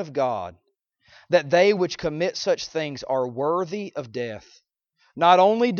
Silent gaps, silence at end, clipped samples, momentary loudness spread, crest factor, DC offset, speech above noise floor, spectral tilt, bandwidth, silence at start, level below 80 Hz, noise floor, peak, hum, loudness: none; 0 s; under 0.1%; 15 LU; 20 dB; under 0.1%; 44 dB; -5 dB/octave; 7.2 kHz; 0 s; -62 dBFS; -66 dBFS; -4 dBFS; none; -23 LUFS